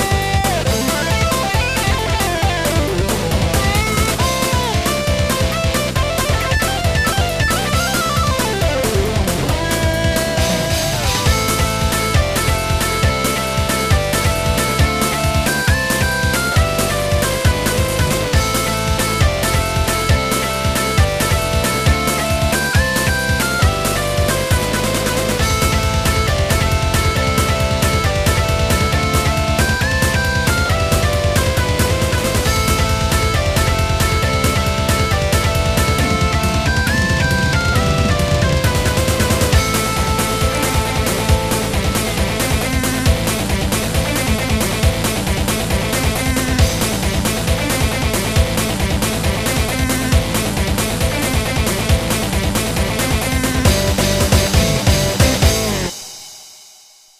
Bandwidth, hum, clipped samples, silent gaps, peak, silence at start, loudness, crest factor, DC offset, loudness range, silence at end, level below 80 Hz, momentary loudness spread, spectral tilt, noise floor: 15.5 kHz; none; under 0.1%; none; 0 dBFS; 0 s; -16 LUFS; 16 dB; under 0.1%; 2 LU; 0.55 s; -24 dBFS; 2 LU; -4 dB/octave; -45 dBFS